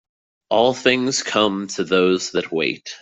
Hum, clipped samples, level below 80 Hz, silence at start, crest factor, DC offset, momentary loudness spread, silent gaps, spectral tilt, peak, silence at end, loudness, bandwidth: none; under 0.1%; -60 dBFS; 0.5 s; 18 dB; under 0.1%; 6 LU; none; -3.5 dB/octave; -2 dBFS; 0.05 s; -19 LUFS; 8.2 kHz